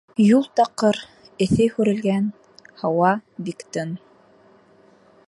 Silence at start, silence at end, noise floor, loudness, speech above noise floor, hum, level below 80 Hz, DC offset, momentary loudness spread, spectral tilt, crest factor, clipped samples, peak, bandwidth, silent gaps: 0.2 s; 1.3 s; -54 dBFS; -21 LUFS; 34 dB; none; -52 dBFS; under 0.1%; 15 LU; -6.5 dB/octave; 18 dB; under 0.1%; -4 dBFS; 11.5 kHz; none